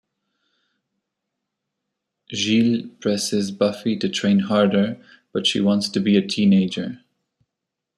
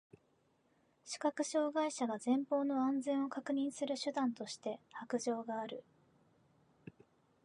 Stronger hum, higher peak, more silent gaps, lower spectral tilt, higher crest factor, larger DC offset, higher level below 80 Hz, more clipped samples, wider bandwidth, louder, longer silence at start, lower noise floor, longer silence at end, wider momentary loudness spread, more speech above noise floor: neither; first, -4 dBFS vs -22 dBFS; neither; about the same, -5 dB/octave vs -4 dB/octave; about the same, 18 dB vs 16 dB; neither; first, -64 dBFS vs -88 dBFS; neither; first, 12.5 kHz vs 11 kHz; first, -20 LUFS vs -38 LUFS; first, 2.3 s vs 1.05 s; first, -83 dBFS vs -75 dBFS; first, 1 s vs 0.55 s; about the same, 12 LU vs 12 LU; first, 63 dB vs 38 dB